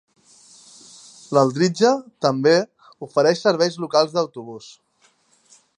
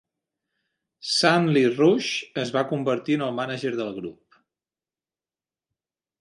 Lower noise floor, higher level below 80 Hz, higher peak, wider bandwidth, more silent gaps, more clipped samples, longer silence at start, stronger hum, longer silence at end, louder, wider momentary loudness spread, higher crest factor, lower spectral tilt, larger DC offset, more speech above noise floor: second, -61 dBFS vs under -90 dBFS; about the same, -74 dBFS vs -70 dBFS; about the same, -2 dBFS vs -4 dBFS; about the same, 10.5 kHz vs 11.5 kHz; neither; neither; first, 1.3 s vs 1.05 s; neither; second, 1.1 s vs 2.1 s; first, -19 LUFS vs -23 LUFS; first, 18 LU vs 13 LU; about the same, 20 dB vs 22 dB; about the same, -5 dB/octave vs -5 dB/octave; neither; second, 42 dB vs over 67 dB